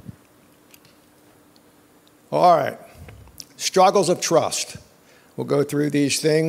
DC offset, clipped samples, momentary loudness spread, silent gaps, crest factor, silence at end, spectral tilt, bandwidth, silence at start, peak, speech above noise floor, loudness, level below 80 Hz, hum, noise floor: under 0.1%; under 0.1%; 24 LU; none; 20 dB; 0 s; -4 dB/octave; 16 kHz; 0.1 s; -2 dBFS; 35 dB; -20 LUFS; -60 dBFS; none; -54 dBFS